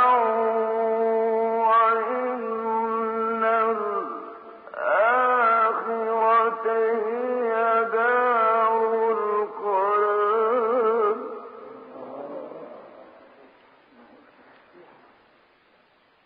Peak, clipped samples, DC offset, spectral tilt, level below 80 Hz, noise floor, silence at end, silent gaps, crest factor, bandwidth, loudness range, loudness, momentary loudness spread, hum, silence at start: -10 dBFS; under 0.1%; under 0.1%; -2 dB/octave; -80 dBFS; -61 dBFS; 3.25 s; none; 14 dB; 4.8 kHz; 10 LU; -22 LUFS; 18 LU; none; 0 s